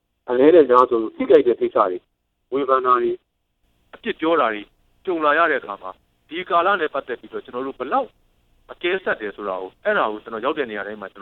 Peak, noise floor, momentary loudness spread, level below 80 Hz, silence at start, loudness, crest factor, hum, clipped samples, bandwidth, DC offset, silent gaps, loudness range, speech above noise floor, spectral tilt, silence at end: 0 dBFS; -67 dBFS; 17 LU; -60 dBFS; 0.25 s; -20 LUFS; 20 dB; none; under 0.1%; 4.3 kHz; under 0.1%; none; 8 LU; 48 dB; -7 dB/octave; 0 s